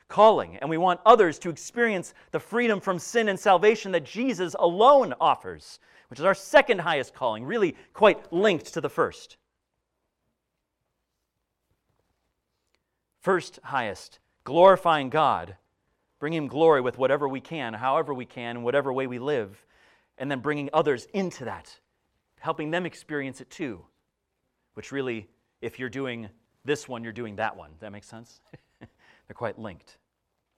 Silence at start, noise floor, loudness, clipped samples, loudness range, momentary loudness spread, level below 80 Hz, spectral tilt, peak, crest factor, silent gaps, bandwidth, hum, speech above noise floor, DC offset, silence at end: 0.1 s; -81 dBFS; -25 LUFS; under 0.1%; 13 LU; 18 LU; -66 dBFS; -5 dB/octave; -4 dBFS; 22 dB; none; 13.5 kHz; none; 56 dB; under 0.1%; 0.8 s